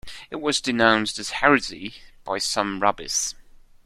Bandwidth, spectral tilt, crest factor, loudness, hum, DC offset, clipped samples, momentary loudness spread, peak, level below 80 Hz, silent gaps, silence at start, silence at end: 14 kHz; -2.5 dB/octave; 22 dB; -22 LUFS; none; under 0.1%; under 0.1%; 16 LU; -2 dBFS; -52 dBFS; none; 0.05 s; 0.3 s